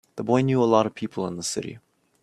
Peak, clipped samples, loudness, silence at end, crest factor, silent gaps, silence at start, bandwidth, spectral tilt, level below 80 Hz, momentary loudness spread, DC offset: -6 dBFS; under 0.1%; -24 LUFS; 0.45 s; 20 dB; none; 0.15 s; 13.5 kHz; -5.5 dB/octave; -64 dBFS; 11 LU; under 0.1%